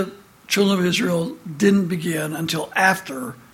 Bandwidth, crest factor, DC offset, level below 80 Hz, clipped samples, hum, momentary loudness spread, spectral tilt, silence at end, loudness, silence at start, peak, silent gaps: 16.5 kHz; 18 dB; under 0.1%; -60 dBFS; under 0.1%; none; 12 LU; -4.5 dB/octave; 0.15 s; -20 LUFS; 0 s; -2 dBFS; none